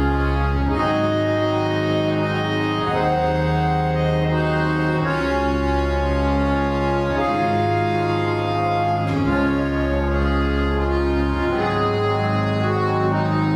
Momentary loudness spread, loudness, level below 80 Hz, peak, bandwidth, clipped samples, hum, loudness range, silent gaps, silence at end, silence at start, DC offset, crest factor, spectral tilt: 1 LU; -20 LUFS; -28 dBFS; -8 dBFS; 11 kHz; under 0.1%; none; 0 LU; none; 0 s; 0 s; under 0.1%; 12 dB; -7.5 dB/octave